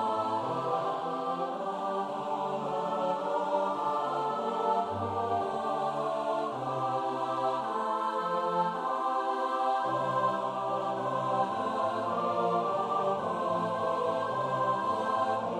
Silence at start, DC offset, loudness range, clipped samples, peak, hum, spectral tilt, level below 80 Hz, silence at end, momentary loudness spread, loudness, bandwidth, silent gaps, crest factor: 0 s; under 0.1%; 2 LU; under 0.1%; -16 dBFS; none; -6 dB/octave; -76 dBFS; 0 s; 3 LU; -31 LUFS; 12.5 kHz; none; 14 dB